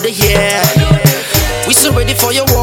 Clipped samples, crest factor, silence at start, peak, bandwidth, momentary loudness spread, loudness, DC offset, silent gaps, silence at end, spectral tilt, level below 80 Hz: 0.2%; 10 dB; 0 s; 0 dBFS; 19.5 kHz; 4 LU; -10 LUFS; under 0.1%; none; 0 s; -3.5 dB/octave; -22 dBFS